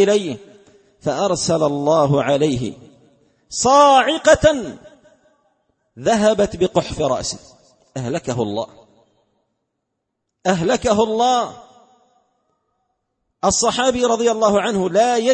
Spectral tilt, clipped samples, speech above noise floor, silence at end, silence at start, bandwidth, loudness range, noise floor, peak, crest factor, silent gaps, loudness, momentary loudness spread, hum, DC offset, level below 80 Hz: -4 dB/octave; under 0.1%; 60 dB; 0 s; 0 s; 8.8 kHz; 8 LU; -76 dBFS; 0 dBFS; 18 dB; none; -17 LUFS; 14 LU; none; under 0.1%; -46 dBFS